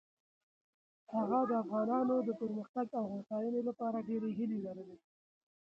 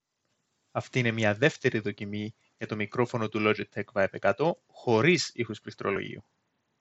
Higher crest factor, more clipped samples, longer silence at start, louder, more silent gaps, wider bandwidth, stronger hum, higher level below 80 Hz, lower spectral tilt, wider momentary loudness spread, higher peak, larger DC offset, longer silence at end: second, 16 dB vs 22 dB; neither; first, 1.1 s vs 0.75 s; second, -37 LUFS vs -29 LUFS; first, 2.69-2.74 s vs none; second, 5.8 kHz vs 8.2 kHz; neither; second, -82 dBFS vs -72 dBFS; first, -10 dB/octave vs -5.5 dB/octave; second, 9 LU vs 13 LU; second, -22 dBFS vs -6 dBFS; neither; first, 0.8 s vs 0.6 s